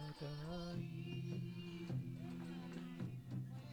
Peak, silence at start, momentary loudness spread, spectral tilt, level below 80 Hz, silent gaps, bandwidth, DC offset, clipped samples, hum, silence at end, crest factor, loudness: -34 dBFS; 0 s; 3 LU; -7.5 dB/octave; -66 dBFS; none; 18.5 kHz; under 0.1%; under 0.1%; none; 0 s; 12 dB; -48 LUFS